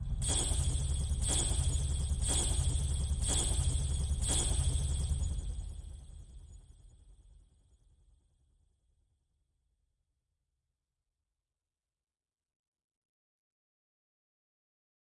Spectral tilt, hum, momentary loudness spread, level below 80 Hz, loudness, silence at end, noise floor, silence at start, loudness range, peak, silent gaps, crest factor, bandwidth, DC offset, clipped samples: -3.5 dB/octave; none; 16 LU; -38 dBFS; -33 LUFS; 8 s; under -90 dBFS; 0 s; 12 LU; -20 dBFS; none; 18 dB; 11.5 kHz; under 0.1%; under 0.1%